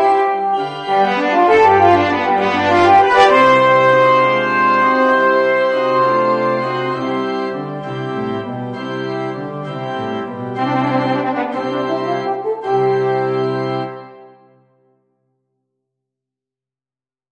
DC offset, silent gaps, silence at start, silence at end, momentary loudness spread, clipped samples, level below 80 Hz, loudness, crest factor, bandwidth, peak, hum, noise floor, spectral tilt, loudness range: under 0.1%; none; 0 s; 3.05 s; 14 LU; under 0.1%; -58 dBFS; -15 LUFS; 16 dB; 9.6 kHz; 0 dBFS; none; under -90 dBFS; -6 dB/octave; 11 LU